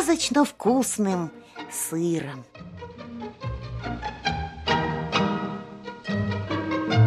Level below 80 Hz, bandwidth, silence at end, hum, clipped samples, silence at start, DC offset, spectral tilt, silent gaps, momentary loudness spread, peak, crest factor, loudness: -46 dBFS; 15 kHz; 0 s; none; under 0.1%; 0 s; under 0.1%; -5 dB/octave; none; 17 LU; -6 dBFS; 20 dB; -26 LUFS